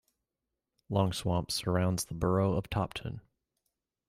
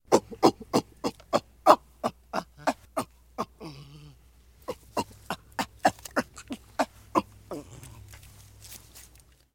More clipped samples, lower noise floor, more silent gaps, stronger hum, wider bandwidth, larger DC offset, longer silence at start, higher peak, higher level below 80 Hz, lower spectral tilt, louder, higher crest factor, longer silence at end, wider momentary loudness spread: neither; first, -88 dBFS vs -57 dBFS; neither; neither; about the same, 15.5 kHz vs 17 kHz; neither; first, 0.9 s vs 0.1 s; second, -16 dBFS vs -2 dBFS; about the same, -54 dBFS vs -56 dBFS; about the same, -5.5 dB/octave vs -4.5 dB/octave; second, -32 LUFS vs -29 LUFS; second, 18 dB vs 28 dB; first, 0.9 s vs 0.55 s; second, 9 LU vs 24 LU